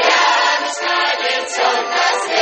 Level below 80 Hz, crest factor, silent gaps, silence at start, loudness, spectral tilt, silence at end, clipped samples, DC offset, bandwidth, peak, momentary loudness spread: -74 dBFS; 14 dB; none; 0 s; -15 LUFS; 1.5 dB/octave; 0 s; under 0.1%; under 0.1%; 9 kHz; 0 dBFS; 6 LU